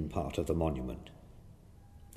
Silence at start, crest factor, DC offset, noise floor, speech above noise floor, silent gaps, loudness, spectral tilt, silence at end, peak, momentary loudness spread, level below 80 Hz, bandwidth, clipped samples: 0 s; 20 dB; under 0.1%; -56 dBFS; 21 dB; none; -36 LUFS; -7.5 dB/octave; 0 s; -16 dBFS; 25 LU; -46 dBFS; 15 kHz; under 0.1%